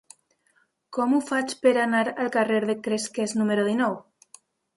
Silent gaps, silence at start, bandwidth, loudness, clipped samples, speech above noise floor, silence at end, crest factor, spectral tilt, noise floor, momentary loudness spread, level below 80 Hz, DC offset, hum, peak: none; 0.9 s; 11.5 kHz; -24 LUFS; under 0.1%; 44 dB; 0.75 s; 18 dB; -4.5 dB/octave; -67 dBFS; 6 LU; -74 dBFS; under 0.1%; none; -8 dBFS